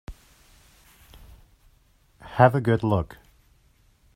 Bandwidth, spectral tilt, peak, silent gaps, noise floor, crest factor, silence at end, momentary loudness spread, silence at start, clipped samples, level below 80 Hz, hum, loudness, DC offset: 15.5 kHz; -8.5 dB/octave; -2 dBFS; none; -61 dBFS; 24 dB; 1.1 s; 19 LU; 0.1 s; under 0.1%; -50 dBFS; none; -22 LUFS; under 0.1%